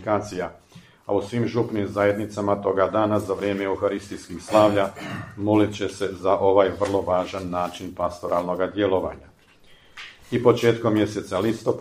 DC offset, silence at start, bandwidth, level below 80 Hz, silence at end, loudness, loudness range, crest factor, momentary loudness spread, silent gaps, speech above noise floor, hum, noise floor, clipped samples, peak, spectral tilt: under 0.1%; 0 s; 15.5 kHz; -54 dBFS; 0 s; -23 LUFS; 3 LU; 20 dB; 13 LU; none; 30 dB; none; -52 dBFS; under 0.1%; -2 dBFS; -6.5 dB/octave